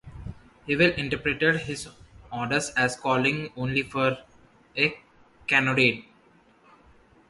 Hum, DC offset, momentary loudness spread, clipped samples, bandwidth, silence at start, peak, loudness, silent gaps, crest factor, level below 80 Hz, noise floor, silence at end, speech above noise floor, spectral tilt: none; under 0.1%; 17 LU; under 0.1%; 11.5 kHz; 0.05 s; -6 dBFS; -25 LUFS; none; 22 dB; -52 dBFS; -59 dBFS; 1.25 s; 34 dB; -4.5 dB/octave